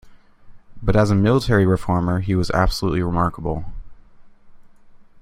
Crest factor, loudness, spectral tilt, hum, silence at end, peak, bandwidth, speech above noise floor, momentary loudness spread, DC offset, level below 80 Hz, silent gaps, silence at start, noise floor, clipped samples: 18 dB; -20 LUFS; -7 dB/octave; none; 0.2 s; -2 dBFS; 14.5 kHz; 27 dB; 11 LU; under 0.1%; -32 dBFS; none; 0.05 s; -45 dBFS; under 0.1%